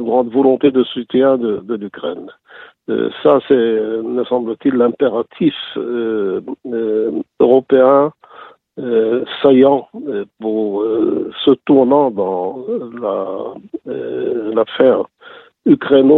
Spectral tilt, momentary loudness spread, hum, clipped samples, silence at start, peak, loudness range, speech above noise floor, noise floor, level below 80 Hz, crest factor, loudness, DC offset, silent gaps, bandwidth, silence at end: -9 dB/octave; 13 LU; none; under 0.1%; 0 s; 0 dBFS; 4 LU; 27 dB; -41 dBFS; -60 dBFS; 14 dB; -15 LUFS; under 0.1%; none; 4.1 kHz; 0 s